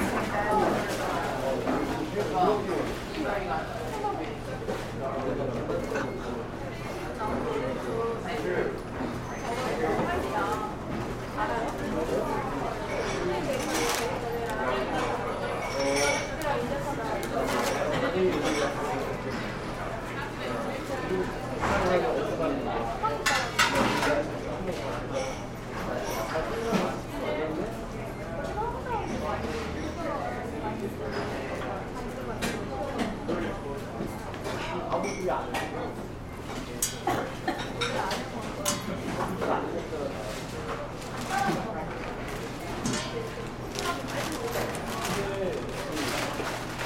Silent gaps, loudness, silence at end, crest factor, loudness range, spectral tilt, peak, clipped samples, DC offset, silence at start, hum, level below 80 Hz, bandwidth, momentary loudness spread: none; -30 LUFS; 0 s; 22 dB; 5 LU; -4.5 dB/octave; -8 dBFS; under 0.1%; under 0.1%; 0 s; none; -46 dBFS; 16.5 kHz; 9 LU